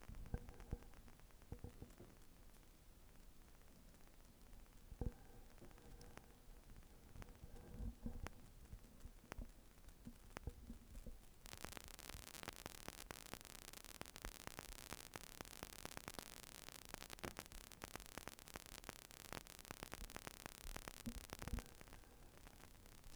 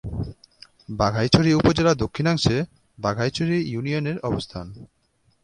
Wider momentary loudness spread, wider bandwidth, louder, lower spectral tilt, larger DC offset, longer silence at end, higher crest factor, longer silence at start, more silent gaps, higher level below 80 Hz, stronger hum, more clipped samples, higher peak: second, 13 LU vs 16 LU; first, over 20 kHz vs 10.5 kHz; second, -56 LUFS vs -22 LUFS; second, -3.5 dB/octave vs -6 dB/octave; neither; second, 0 s vs 0.6 s; about the same, 26 dB vs 24 dB; about the same, 0 s vs 0.05 s; neither; second, -60 dBFS vs -42 dBFS; neither; neither; second, -28 dBFS vs 0 dBFS